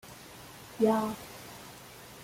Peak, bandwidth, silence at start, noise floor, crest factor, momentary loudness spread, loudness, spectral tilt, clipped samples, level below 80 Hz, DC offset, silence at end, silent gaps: -14 dBFS; 16.5 kHz; 0.05 s; -50 dBFS; 20 dB; 20 LU; -30 LUFS; -5.5 dB/octave; under 0.1%; -66 dBFS; under 0.1%; 0 s; none